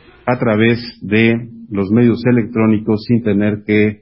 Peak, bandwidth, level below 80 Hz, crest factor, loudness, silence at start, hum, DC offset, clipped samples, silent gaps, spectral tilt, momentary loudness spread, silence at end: 0 dBFS; 5.8 kHz; -46 dBFS; 14 dB; -15 LUFS; 0.25 s; none; under 0.1%; under 0.1%; none; -12.5 dB/octave; 8 LU; 0.05 s